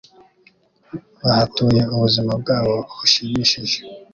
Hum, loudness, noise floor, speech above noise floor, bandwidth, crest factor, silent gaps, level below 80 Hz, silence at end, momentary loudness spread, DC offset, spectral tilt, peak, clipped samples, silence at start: none; -18 LUFS; -56 dBFS; 38 dB; 7.4 kHz; 18 dB; none; -48 dBFS; 0.1 s; 9 LU; under 0.1%; -5 dB/octave; -2 dBFS; under 0.1%; 0.95 s